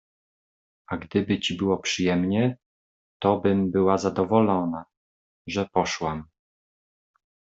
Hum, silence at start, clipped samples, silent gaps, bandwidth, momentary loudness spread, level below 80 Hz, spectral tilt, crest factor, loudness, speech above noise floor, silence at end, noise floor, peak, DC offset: none; 0.9 s; under 0.1%; 2.66-3.20 s, 4.97-5.45 s; 8 kHz; 13 LU; -60 dBFS; -5.5 dB/octave; 20 dB; -24 LUFS; over 66 dB; 1.3 s; under -90 dBFS; -6 dBFS; under 0.1%